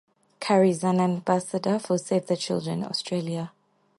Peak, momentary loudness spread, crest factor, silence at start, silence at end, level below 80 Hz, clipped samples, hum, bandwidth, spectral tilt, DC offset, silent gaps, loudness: -8 dBFS; 10 LU; 18 dB; 0.4 s; 0.5 s; -70 dBFS; under 0.1%; none; 11.5 kHz; -6 dB/octave; under 0.1%; none; -26 LUFS